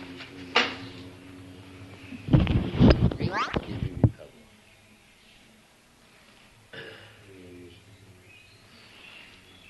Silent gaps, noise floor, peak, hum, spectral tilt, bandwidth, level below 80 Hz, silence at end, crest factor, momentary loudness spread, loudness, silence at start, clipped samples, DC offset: none; -58 dBFS; -4 dBFS; none; -7 dB/octave; 12 kHz; -38 dBFS; 0.5 s; 26 dB; 27 LU; -25 LUFS; 0 s; under 0.1%; under 0.1%